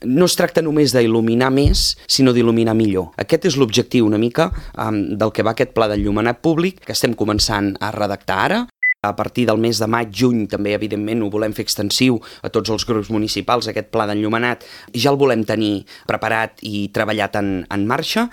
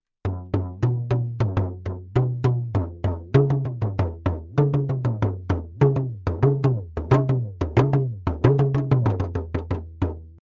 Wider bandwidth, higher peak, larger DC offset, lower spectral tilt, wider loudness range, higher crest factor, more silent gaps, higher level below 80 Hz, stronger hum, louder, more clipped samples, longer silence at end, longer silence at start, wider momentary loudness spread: first, 18 kHz vs 6.8 kHz; about the same, 0 dBFS vs -2 dBFS; neither; second, -5 dB/octave vs -10 dB/octave; about the same, 4 LU vs 2 LU; about the same, 18 dB vs 20 dB; neither; about the same, -34 dBFS vs -36 dBFS; neither; first, -18 LUFS vs -24 LUFS; neither; second, 0 s vs 0.2 s; second, 0 s vs 0.25 s; about the same, 7 LU vs 9 LU